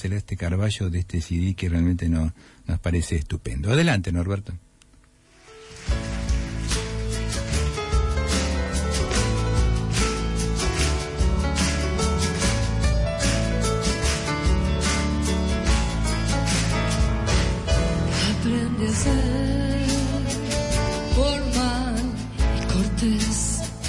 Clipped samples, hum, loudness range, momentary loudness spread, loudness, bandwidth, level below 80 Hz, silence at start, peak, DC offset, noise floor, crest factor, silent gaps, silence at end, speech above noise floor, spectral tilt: under 0.1%; none; 4 LU; 5 LU; -24 LUFS; 11.5 kHz; -28 dBFS; 0 s; -10 dBFS; under 0.1%; -55 dBFS; 14 dB; none; 0 s; 31 dB; -5 dB/octave